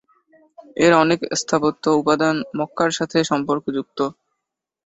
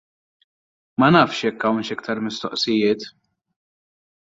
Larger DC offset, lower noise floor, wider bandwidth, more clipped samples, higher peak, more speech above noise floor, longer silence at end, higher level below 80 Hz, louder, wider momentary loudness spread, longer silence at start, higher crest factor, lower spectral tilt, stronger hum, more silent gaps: neither; second, -82 dBFS vs under -90 dBFS; about the same, 8.2 kHz vs 7.8 kHz; neither; about the same, -2 dBFS vs -2 dBFS; second, 62 dB vs over 70 dB; second, 0.75 s vs 1.15 s; about the same, -60 dBFS vs -60 dBFS; about the same, -19 LUFS vs -20 LUFS; about the same, 11 LU vs 12 LU; second, 0.6 s vs 1 s; about the same, 20 dB vs 20 dB; about the same, -4.5 dB/octave vs -5.5 dB/octave; neither; neither